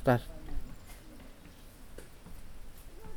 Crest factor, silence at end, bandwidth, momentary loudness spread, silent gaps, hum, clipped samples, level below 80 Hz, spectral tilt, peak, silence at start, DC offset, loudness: 24 dB; 0 s; 20 kHz; 17 LU; none; none; under 0.1%; -46 dBFS; -7 dB/octave; -12 dBFS; 0 s; under 0.1%; -37 LUFS